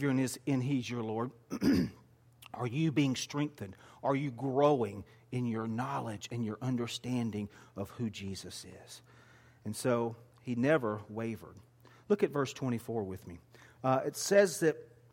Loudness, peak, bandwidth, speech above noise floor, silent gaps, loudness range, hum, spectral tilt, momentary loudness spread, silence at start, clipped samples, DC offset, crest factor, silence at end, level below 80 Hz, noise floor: -34 LUFS; -14 dBFS; 16.5 kHz; 27 dB; none; 6 LU; none; -5.5 dB/octave; 17 LU; 0 s; under 0.1%; under 0.1%; 20 dB; 0.25 s; -66 dBFS; -60 dBFS